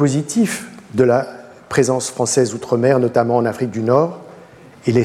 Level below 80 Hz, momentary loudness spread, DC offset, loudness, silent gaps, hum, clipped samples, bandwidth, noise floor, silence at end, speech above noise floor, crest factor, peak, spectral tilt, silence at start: -58 dBFS; 9 LU; under 0.1%; -17 LUFS; none; none; under 0.1%; 15 kHz; -42 dBFS; 0 s; 26 dB; 16 dB; -2 dBFS; -5.5 dB/octave; 0 s